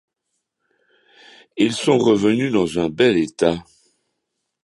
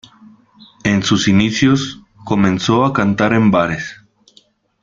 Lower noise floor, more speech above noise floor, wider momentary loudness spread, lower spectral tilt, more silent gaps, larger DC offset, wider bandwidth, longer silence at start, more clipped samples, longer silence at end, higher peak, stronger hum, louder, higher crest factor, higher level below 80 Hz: first, -77 dBFS vs -53 dBFS; first, 59 dB vs 39 dB; second, 6 LU vs 11 LU; about the same, -5.5 dB/octave vs -5.5 dB/octave; neither; neither; first, 11.5 kHz vs 7.6 kHz; first, 1.55 s vs 0.85 s; neither; first, 1.05 s vs 0.9 s; about the same, -2 dBFS vs 0 dBFS; neither; second, -18 LUFS vs -15 LUFS; about the same, 20 dB vs 16 dB; second, -54 dBFS vs -46 dBFS